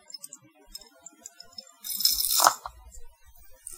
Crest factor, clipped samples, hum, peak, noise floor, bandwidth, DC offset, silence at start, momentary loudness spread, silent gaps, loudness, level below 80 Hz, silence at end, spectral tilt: 30 dB; under 0.1%; none; 0 dBFS; -52 dBFS; 18 kHz; under 0.1%; 0.15 s; 25 LU; none; -23 LUFS; -54 dBFS; 0 s; 1.5 dB/octave